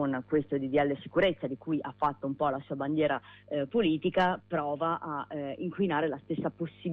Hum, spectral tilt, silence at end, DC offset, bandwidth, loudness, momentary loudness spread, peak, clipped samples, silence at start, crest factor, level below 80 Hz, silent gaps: none; -8.5 dB/octave; 0 s; under 0.1%; 6 kHz; -31 LUFS; 8 LU; -16 dBFS; under 0.1%; 0 s; 16 dB; -62 dBFS; none